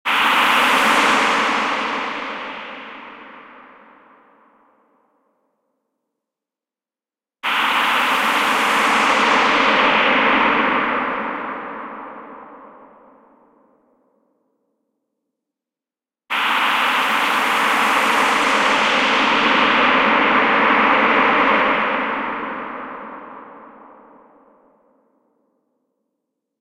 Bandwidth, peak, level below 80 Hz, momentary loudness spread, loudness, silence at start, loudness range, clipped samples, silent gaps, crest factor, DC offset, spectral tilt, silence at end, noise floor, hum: 16 kHz; -2 dBFS; -56 dBFS; 18 LU; -16 LUFS; 0.05 s; 17 LU; under 0.1%; none; 18 dB; under 0.1%; -2 dB/octave; 2.9 s; under -90 dBFS; none